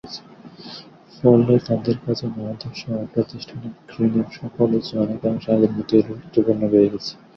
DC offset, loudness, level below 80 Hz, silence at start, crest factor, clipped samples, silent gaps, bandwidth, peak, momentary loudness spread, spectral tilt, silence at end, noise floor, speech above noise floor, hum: under 0.1%; -20 LUFS; -54 dBFS; 0.05 s; 20 dB; under 0.1%; none; 6.6 kHz; -2 dBFS; 19 LU; -8.5 dB/octave; 0.25 s; -42 dBFS; 22 dB; none